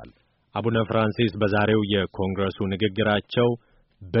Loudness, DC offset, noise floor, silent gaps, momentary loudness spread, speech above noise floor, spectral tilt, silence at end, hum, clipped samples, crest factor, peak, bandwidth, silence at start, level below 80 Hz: -24 LUFS; under 0.1%; -53 dBFS; none; 6 LU; 30 dB; -5 dB/octave; 0 s; none; under 0.1%; 16 dB; -8 dBFS; 5.8 kHz; 0 s; -54 dBFS